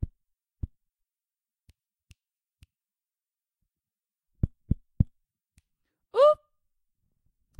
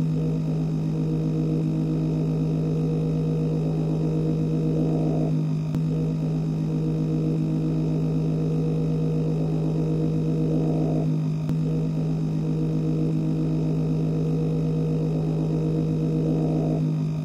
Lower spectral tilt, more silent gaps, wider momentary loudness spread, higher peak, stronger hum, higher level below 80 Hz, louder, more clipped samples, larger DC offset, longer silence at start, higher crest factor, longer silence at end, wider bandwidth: about the same, -8.5 dB/octave vs -9.5 dB/octave; neither; first, 22 LU vs 2 LU; first, -8 dBFS vs -12 dBFS; neither; about the same, -44 dBFS vs -44 dBFS; second, -27 LUFS vs -24 LUFS; neither; neither; about the same, 0 s vs 0 s; first, 26 dB vs 10 dB; first, 1.25 s vs 0 s; first, 9.4 kHz vs 6.8 kHz